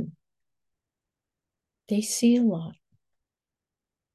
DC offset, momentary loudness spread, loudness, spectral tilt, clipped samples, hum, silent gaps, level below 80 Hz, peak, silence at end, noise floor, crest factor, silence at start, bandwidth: under 0.1%; 17 LU; -25 LUFS; -5 dB/octave; under 0.1%; none; none; -76 dBFS; -12 dBFS; 1.4 s; -90 dBFS; 18 dB; 0 s; 12.5 kHz